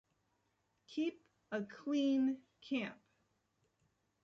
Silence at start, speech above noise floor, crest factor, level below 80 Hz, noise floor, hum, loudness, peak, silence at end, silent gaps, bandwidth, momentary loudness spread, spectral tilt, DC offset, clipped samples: 0.9 s; 44 dB; 16 dB; -86 dBFS; -81 dBFS; none; -39 LUFS; -26 dBFS; 1.3 s; none; 7.4 kHz; 13 LU; -4 dB/octave; under 0.1%; under 0.1%